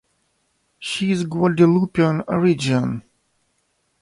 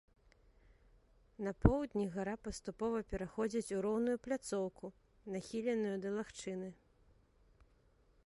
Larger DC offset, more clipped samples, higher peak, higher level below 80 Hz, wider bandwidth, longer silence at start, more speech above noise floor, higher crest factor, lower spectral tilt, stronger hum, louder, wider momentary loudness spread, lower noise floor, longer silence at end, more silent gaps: neither; neither; first, -4 dBFS vs -10 dBFS; about the same, -56 dBFS vs -52 dBFS; about the same, 11.5 kHz vs 11.5 kHz; second, 0.8 s vs 1.4 s; first, 50 dB vs 32 dB; second, 18 dB vs 30 dB; about the same, -6.5 dB/octave vs -6.5 dB/octave; neither; first, -19 LUFS vs -39 LUFS; about the same, 11 LU vs 12 LU; about the same, -68 dBFS vs -70 dBFS; second, 1 s vs 1.5 s; neither